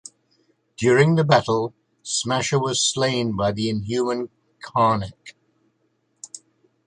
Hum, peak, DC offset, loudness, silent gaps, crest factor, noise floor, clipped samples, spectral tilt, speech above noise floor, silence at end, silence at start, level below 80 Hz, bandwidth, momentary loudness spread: none; -2 dBFS; under 0.1%; -21 LUFS; none; 20 dB; -69 dBFS; under 0.1%; -4.5 dB/octave; 48 dB; 0.5 s; 0.8 s; -54 dBFS; 11 kHz; 22 LU